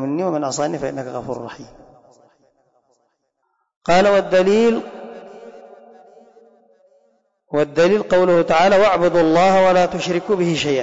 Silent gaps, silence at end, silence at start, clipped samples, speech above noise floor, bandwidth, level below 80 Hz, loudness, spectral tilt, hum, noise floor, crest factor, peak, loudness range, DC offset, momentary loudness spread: 3.76-3.81 s; 0 s; 0 s; under 0.1%; 54 dB; 7.8 kHz; -52 dBFS; -16 LUFS; -5.5 dB/octave; none; -70 dBFS; 12 dB; -6 dBFS; 13 LU; under 0.1%; 16 LU